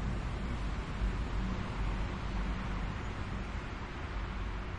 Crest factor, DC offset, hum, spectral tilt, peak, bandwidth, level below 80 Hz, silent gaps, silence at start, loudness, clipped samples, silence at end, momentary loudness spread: 14 dB; under 0.1%; none; -6.5 dB/octave; -22 dBFS; 9.2 kHz; -38 dBFS; none; 0 s; -39 LUFS; under 0.1%; 0 s; 4 LU